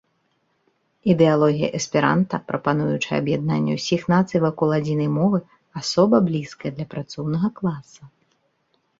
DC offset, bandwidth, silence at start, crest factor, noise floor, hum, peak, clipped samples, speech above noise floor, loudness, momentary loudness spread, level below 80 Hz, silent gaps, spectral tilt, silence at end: under 0.1%; 7.8 kHz; 1.05 s; 18 dB; -68 dBFS; none; -4 dBFS; under 0.1%; 48 dB; -21 LUFS; 12 LU; -58 dBFS; none; -6.5 dB/octave; 0.9 s